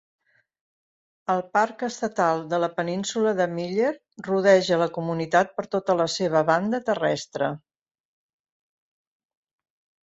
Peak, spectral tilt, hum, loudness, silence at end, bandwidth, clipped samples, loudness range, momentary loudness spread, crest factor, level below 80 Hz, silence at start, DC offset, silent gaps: -6 dBFS; -5 dB/octave; none; -24 LUFS; 2.5 s; 8 kHz; under 0.1%; 5 LU; 9 LU; 20 dB; -70 dBFS; 1.3 s; under 0.1%; none